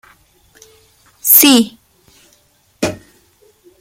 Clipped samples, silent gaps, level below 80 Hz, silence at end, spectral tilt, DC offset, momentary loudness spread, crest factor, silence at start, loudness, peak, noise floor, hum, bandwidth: 0.2%; none; -56 dBFS; 0.85 s; -2 dB/octave; under 0.1%; 16 LU; 18 dB; 1.25 s; -10 LUFS; 0 dBFS; -55 dBFS; none; 17 kHz